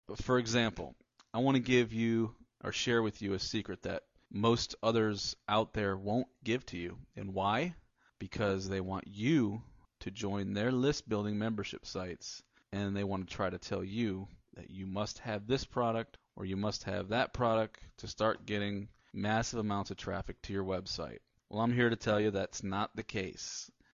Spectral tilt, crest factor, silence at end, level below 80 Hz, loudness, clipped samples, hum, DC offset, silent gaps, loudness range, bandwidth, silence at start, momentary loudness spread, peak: -5 dB/octave; 20 dB; 0.25 s; -56 dBFS; -35 LUFS; under 0.1%; none; under 0.1%; none; 4 LU; 7.6 kHz; 0.1 s; 14 LU; -16 dBFS